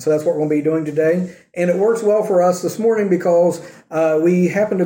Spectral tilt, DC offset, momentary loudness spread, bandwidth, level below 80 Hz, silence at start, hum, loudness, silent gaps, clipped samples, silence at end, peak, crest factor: -7 dB/octave; under 0.1%; 6 LU; 16.5 kHz; -66 dBFS; 0 s; none; -17 LUFS; none; under 0.1%; 0 s; -4 dBFS; 12 dB